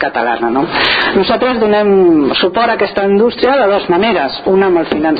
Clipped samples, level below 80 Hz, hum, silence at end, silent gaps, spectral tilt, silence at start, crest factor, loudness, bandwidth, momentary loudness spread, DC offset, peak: under 0.1%; -44 dBFS; none; 0 s; none; -7.5 dB/octave; 0 s; 10 dB; -11 LUFS; 5 kHz; 4 LU; under 0.1%; 0 dBFS